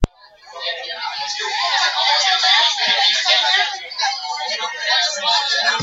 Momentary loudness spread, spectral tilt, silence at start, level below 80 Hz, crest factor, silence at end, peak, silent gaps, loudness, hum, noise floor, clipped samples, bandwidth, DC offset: 12 LU; -0.5 dB/octave; 0 s; -38 dBFS; 18 dB; 0 s; 0 dBFS; none; -16 LUFS; none; -44 dBFS; under 0.1%; 8.6 kHz; under 0.1%